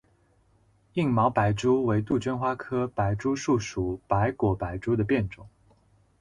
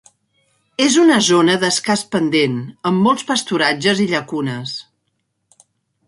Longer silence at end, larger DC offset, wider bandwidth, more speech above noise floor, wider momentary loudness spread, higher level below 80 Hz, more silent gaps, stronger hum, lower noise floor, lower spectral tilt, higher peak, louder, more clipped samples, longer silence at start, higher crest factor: second, 0.7 s vs 1.25 s; neither; about the same, 10.5 kHz vs 11.5 kHz; second, 38 dB vs 54 dB; second, 7 LU vs 11 LU; first, -48 dBFS vs -62 dBFS; neither; neither; second, -64 dBFS vs -70 dBFS; first, -7 dB/octave vs -4 dB/octave; second, -8 dBFS vs -2 dBFS; second, -27 LUFS vs -16 LUFS; neither; first, 0.95 s vs 0.8 s; about the same, 18 dB vs 16 dB